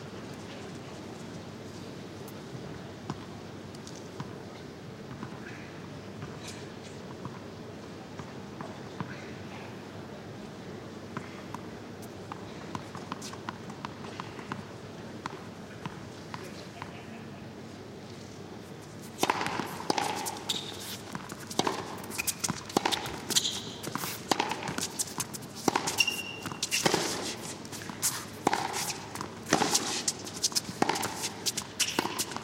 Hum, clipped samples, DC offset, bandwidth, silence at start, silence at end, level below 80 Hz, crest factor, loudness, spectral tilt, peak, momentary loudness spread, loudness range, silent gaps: none; under 0.1%; under 0.1%; 16.5 kHz; 0 s; 0 s; -64 dBFS; 28 dB; -34 LUFS; -2.5 dB/octave; -8 dBFS; 15 LU; 13 LU; none